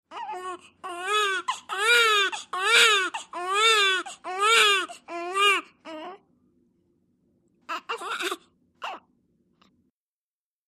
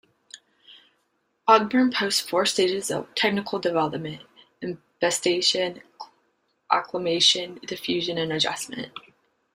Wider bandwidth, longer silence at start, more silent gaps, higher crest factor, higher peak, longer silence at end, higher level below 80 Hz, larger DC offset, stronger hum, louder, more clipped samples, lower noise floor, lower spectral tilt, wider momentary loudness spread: about the same, 15.5 kHz vs 16 kHz; second, 0.1 s vs 0.35 s; neither; about the same, 22 dB vs 22 dB; about the same, -6 dBFS vs -4 dBFS; first, 1.7 s vs 0.55 s; second, -82 dBFS vs -68 dBFS; neither; neither; about the same, -22 LUFS vs -23 LUFS; neither; first, under -90 dBFS vs -72 dBFS; second, 1.5 dB/octave vs -3 dB/octave; first, 21 LU vs 18 LU